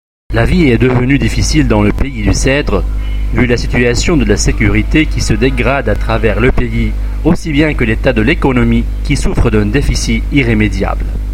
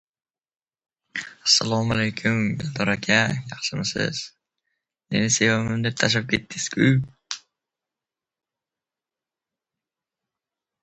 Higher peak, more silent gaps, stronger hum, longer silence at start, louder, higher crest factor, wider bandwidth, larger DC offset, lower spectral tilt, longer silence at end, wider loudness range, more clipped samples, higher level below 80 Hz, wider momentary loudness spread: about the same, 0 dBFS vs -2 dBFS; neither; neither; second, 0.3 s vs 1.15 s; first, -12 LUFS vs -22 LUFS; second, 10 dB vs 24 dB; first, 13 kHz vs 9 kHz; neither; first, -5.5 dB/octave vs -3.5 dB/octave; second, 0 s vs 3.45 s; second, 1 LU vs 6 LU; neither; first, -16 dBFS vs -56 dBFS; second, 6 LU vs 15 LU